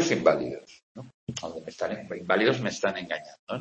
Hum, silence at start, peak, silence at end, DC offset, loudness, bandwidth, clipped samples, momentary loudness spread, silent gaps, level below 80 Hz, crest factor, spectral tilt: none; 0 s; -6 dBFS; 0 s; under 0.1%; -28 LUFS; 8.6 kHz; under 0.1%; 18 LU; 0.83-0.95 s, 1.14-1.27 s, 3.39-3.47 s; -66 dBFS; 22 dB; -4.5 dB/octave